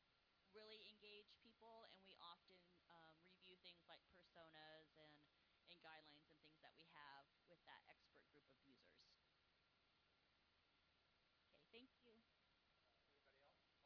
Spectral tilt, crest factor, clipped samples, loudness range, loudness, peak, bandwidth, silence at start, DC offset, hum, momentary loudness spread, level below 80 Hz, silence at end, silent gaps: -1 dB/octave; 22 dB; under 0.1%; 2 LU; -67 LUFS; -50 dBFS; 5.2 kHz; 0 s; under 0.1%; none; 6 LU; under -90 dBFS; 0 s; none